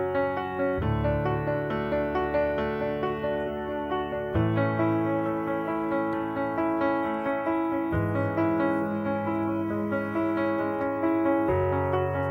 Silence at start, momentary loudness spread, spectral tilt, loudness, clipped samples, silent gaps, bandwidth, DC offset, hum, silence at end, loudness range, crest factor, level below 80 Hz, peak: 0 s; 4 LU; -9.5 dB/octave; -27 LUFS; under 0.1%; none; 13.5 kHz; under 0.1%; none; 0 s; 1 LU; 14 dB; -46 dBFS; -12 dBFS